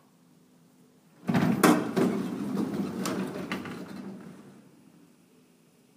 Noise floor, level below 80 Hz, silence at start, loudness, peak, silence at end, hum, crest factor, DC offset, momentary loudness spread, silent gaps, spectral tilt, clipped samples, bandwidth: -61 dBFS; -70 dBFS; 1.25 s; -28 LUFS; -6 dBFS; 1.4 s; none; 24 dB; under 0.1%; 20 LU; none; -5.5 dB/octave; under 0.1%; 15.5 kHz